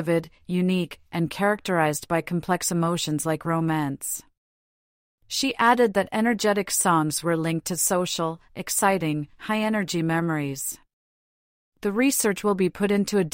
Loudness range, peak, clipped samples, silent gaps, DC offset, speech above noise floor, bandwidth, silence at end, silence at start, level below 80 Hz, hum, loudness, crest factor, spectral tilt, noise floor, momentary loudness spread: 4 LU; -6 dBFS; under 0.1%; 4.38-5.18 s, 10.93-11.72 s; under 0.1%; over 66 dB; 16.5 kHz; 0.05 s; 0 s; -60 dBFS; none; -24 LUFS; 18 dB; -4.5 dB/octave; under -90 dBFS; 9 LU